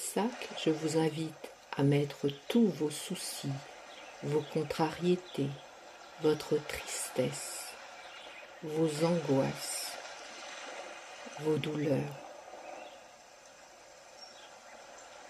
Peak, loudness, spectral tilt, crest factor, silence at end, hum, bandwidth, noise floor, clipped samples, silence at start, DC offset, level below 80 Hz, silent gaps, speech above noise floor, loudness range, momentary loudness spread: -16 dBFS; -34 LUFS; -5 dB/octave; 18 dB; 0 s; none; 14.5 kHz; -56 dBFS; under 0.1%; 0 s; under 0.1%; -72 dBFS; none; 23 dB; 6 LU; 21 LU